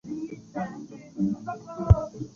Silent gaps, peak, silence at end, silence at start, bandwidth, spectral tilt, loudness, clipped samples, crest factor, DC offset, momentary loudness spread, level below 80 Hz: none; -4 dBFS; 0.05 s; 0.05 s; 7 kHz; -9.5 dB/octave; -28 LUFS; under 0.1%; 24 dB; under 0.1%; 15 LU; -34 dBFS